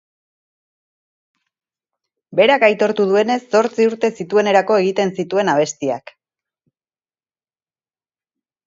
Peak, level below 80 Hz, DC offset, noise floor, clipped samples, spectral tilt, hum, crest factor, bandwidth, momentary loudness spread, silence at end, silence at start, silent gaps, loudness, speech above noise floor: 0 dBFS; -70 dBFS; under 0.1%; under -90 dBFS; under 0.1%; -4.5 dB/octave; none; 18 dB; 7.8 kHz; 8 LU; 2.7 s; 2.3 s; none; -16 LUFS; over 74 dB